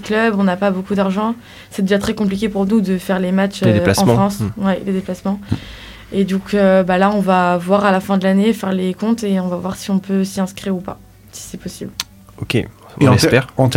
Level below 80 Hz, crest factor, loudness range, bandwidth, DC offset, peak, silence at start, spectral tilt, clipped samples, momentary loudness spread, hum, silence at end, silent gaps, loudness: -44 dBFS; 16 dB; 6 LU; 16 kHz; under 0.1%; 0 dBFS; 0 s; -6 dB/octave; under 0.1%; 16 LU; none; 0 s; none; -16 LUFS